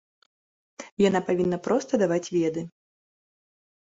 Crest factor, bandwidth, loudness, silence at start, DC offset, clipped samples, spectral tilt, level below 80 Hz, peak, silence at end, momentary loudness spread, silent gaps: 18 dB; 8 kHz; -25 LUFS; 0.8 s; under 0.1%; under 0.1%; -6 dB/octave; -64 dBFS; -10 dBFS; 1.25 s; 18 LU; 0.92-0.97 s